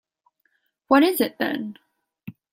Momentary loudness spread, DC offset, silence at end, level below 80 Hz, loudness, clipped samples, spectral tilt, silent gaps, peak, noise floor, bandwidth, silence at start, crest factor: 26 LU; under 0.1%; 0.2 s; -68 dBFS; -21 LUFS; under 0.1%; -4 dB/octave; none; -4 dBFS; -70 dBFS; 16.5 kHz; 0.9 s; 22 dB